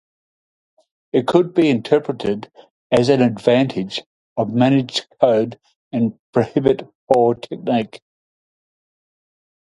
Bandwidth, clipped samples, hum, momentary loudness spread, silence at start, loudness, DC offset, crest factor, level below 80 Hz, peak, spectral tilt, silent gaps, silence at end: 11.5 kHz; under 0.1%; none; 10 LU; 1.15 s; -18 LUFS; under 0.1%; 18 dB; -56 dBFS; 0 dBFS; -6.5 dB/octave; 2.70-2.90 s, 4.06-4.36 s, 5.76-5.91 s, 6.19-6.33 s, 6.95-7.07 s; 1.65 s